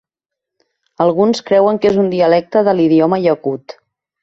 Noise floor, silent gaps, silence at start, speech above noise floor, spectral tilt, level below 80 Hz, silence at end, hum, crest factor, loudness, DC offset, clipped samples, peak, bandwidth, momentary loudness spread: -83 dBFS; none; 1 s; 70 dB; -7 dB/octave; -56 dBFS; 0.5 s; none; 14 dB; -13 LUFS; under 0.1%; under 0.1%; -2 dBFS; 8 kHz; 6 LU